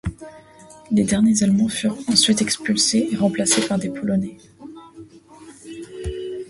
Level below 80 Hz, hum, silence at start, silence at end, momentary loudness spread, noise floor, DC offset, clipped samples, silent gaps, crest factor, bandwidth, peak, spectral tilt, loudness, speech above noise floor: -44 dBFS; none; 0.05 s; 0.05 s; 20 LU; -44 dBFS; under 0.1%; under 0.1%; none; 20 dB; 11.5 kHz; -2 dBFS; -3.5 dB/octave; -19 LUFS; 25 dB